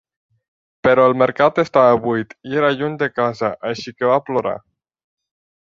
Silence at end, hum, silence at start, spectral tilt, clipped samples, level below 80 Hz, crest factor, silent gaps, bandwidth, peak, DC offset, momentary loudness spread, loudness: 1 s; none; 0.85 s; -6.5 dB/octave; under 0.1%; -56 dBFS; 16 dB; none; 7.4 kHz; -2 dBFS; under 0.1%; 10 LU; -17 LUFS